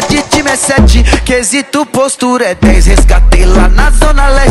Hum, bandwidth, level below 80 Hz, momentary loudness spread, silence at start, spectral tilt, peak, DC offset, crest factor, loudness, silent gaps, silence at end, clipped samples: none; 12.5 kHz; -8 dBFS; 4 LU; 0 s; -4.5 dB/octave; 0 dBFS; under 0.1%; 6 dB; -8 LUFS; none; 0 s; 0.1%